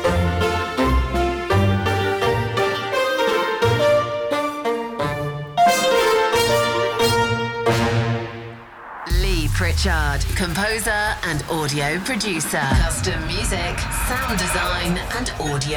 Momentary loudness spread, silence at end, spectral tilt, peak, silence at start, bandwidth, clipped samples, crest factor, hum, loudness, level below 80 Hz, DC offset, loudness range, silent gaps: 7 LU; 0 s; -4.5 dB/octave; -8 dBFS; 0 s; over 20 kHz; under 0.1%; 12 dB; none; -20 LUFS; -30 dBFS; under 0.1%; 3 LU; none